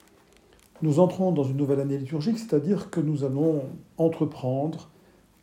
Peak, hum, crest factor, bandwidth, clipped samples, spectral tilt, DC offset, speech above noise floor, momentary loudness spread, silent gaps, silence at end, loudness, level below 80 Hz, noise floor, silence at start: -8 dBFS; none; 18 dB; 13.5 kHz; under 0.1%; -8.5 dB/octave; under 0.1%; 32 dB; 8 LU; none; 0.55 s; -26 LUFS; -66 dBFS; -57 dBFS; 0.8 s